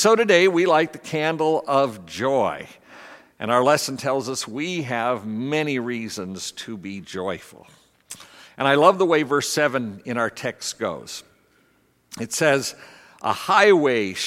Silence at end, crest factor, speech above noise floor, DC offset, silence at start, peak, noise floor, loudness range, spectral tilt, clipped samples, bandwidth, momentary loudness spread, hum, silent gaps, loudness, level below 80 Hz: 0 s; 20 dB; 41 dB; under 0.1%; 0 s; -2 dBFS; -62 dBFS; 6 LU; -4 dB/octave; under 0.1%; 16 kHz; 18 LU; none; none; -21 LUFS; -68 dBFS